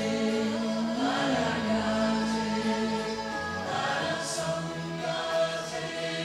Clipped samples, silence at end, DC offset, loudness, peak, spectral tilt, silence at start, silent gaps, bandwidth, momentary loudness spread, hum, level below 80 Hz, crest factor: under 0.1%; 0 s; under 0.1%; -29 LUFS; -16 dBFS; -4.5 dB/octave; 0 s; none; 13.5 kHz; 5 LU; none; -58 dBFS; 14 dB